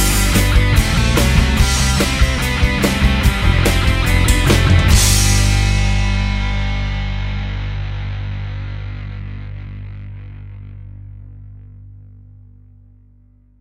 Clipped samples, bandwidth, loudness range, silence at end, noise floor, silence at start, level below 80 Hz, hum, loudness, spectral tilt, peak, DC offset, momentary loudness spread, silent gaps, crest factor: under 0.1%; 16.5 kHz; 19 LU; 1.6 s; -49 dBFS; 0 s; -20 dBFS; 50 Hz at -25 dBFS; -16 LUFS; -4 dB/octave; 0 dBFS; under 0.1%; 21 LU; none; 14 dB